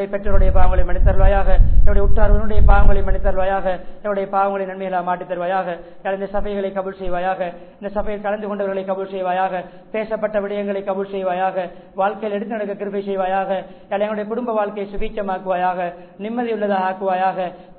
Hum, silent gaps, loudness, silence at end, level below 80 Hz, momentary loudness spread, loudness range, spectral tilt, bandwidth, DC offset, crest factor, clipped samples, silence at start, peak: none; none; -21 LUFS; 0.25 s; -20 dBFS; 8 LU; 5 LU; -10.5 dB/octave; 4.1 kHz; under 0.1%; 16 dB; 0.1%; 0 s; 0 dBFS